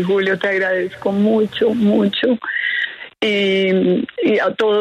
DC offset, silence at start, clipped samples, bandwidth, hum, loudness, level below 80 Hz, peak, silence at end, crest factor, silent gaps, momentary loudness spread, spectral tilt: under 0.1%; 0 s; under 0.1%; 9 kHz; none; -17 LUFS; -60 dBFS; -6 dBFS; 0 s; 12 dB; none; 4 LU; -6.5 dB/octave